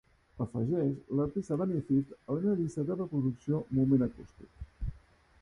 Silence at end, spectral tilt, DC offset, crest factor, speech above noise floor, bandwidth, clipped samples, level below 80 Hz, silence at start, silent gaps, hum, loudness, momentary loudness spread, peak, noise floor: 0.45 s; -10 dB/octave; under 0.1%; 18 dB; 26 dB; 10.5 kHz; under 0.1%; -52 dBFS; 0.35 s; none; none; -32 LUFS; 15 LU; -16 dBFS; -57 dBFS